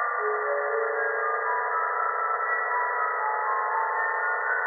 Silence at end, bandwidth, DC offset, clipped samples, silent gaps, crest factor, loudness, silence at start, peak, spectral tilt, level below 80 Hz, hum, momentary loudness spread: 0 s; 2.2 kHz; under 0.1%; under 0.1%; none; 12 dB; -26 LUFS; 0 s; -14 dBFS; 14.5 dB/octave; under -90 dBFS; none; 1 LU